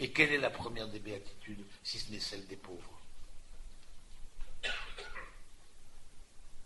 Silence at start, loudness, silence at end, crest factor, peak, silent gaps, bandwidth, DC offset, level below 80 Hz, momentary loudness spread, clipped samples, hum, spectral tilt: 0 s; -37 LUFS; 0 s; 28 dB; -12 dBFS; none; 11.5 kHz; under 0.1%; -50 dBFS; 27 LU; under 0.1%; none; -3.5 dB/octave